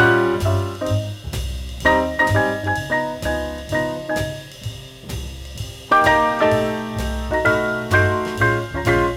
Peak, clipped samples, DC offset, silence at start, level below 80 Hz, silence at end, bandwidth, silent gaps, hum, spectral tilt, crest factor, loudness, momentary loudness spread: -2 dBFS; under 0.1%; under 0.1%; 0 s; -34 dBFS; 0 s; 16.5 kHz; none; none; -5.5 dB/octave; 18 dB; -19 LUFS; 16 LU